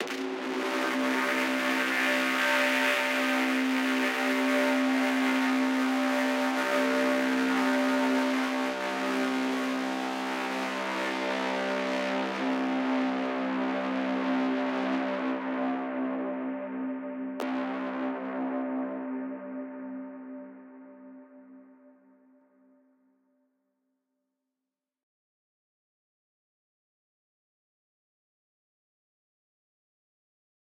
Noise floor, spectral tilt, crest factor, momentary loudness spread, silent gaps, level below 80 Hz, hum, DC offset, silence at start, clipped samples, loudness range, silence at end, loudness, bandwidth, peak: -89 dBFS; -3.5 dB/octave; 18 dB; 9 LU; none; -86 dBFS; none; under 0.1%; 0 s; under 0.1%; 10 LU; 9.05 s; -28 LUFS; 16 kHz; -12 dBFS